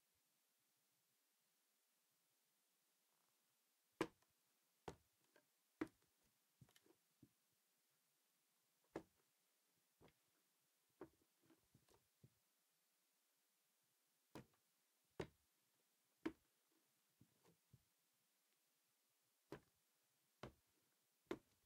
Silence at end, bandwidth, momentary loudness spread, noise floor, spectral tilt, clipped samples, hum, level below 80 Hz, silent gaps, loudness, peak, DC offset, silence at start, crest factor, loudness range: 0.25 s; 15.5 kHz; 14 LU; -86 dBFS; -5 dB/octave; under 0.1%; none; -88 dBFS; none; -58 LUFS; -28 dBFS; under 0.1%; 4 s; 36 dB; 10 LU